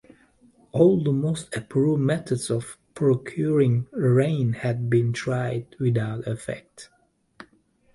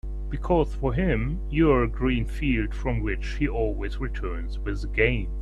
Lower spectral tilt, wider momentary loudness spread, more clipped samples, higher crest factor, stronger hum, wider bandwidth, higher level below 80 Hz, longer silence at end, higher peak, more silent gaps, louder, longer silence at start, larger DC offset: about the same, -7.5 dB/octave vs -8 dB/octave; about the same, 10 LU vs 10 LU; neither; about the same, 18 dB vs 18 dB; neither; first, 11.5 kHz vs 7.2 kHz; second, -58 dBFS vs -30 dBFS; first, 0.5 s vs 0 s; about the same, -6 dBFS vs -6 dBFS; neither; about the same, -24 LUFS vs -26 LUFS; first, 0.75 s vs 0.05 s; neither